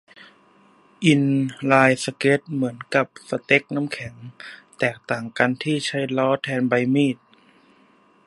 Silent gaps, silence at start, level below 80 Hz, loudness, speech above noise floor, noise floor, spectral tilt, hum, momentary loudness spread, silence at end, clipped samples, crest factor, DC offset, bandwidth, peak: none; 1 s; -66 dBFS; -21 LUFS; 35 dB; -57 dBFS; -5.5 dB/octave; none; 14 LU; 1.1 s; under 0.1%; 22 dB; under 0.1%; 11.5 kHz; 0 dBFS